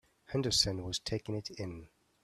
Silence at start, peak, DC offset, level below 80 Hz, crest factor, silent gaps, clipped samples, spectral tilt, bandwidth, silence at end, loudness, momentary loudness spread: 0.3 s; -14 dBFS; under 0.1%; -56 dBFS; 22 dB; none; under 0.1%; -3.5 dB/octave; 15 kHz; 0.4 s; -34 LUFS; 15 LU